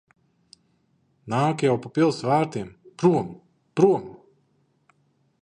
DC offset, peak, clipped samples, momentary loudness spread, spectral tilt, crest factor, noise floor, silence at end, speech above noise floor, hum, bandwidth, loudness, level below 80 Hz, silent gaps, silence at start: under 0.1%; -4 dBFS; under 0.1%; 14 LU; -7 dB/octave; 20 dB; -67 dBFS; 1.25 s; 45 dB; none; 10 kHz; -23 LUFS; -66 dBFS; none; 1.25 s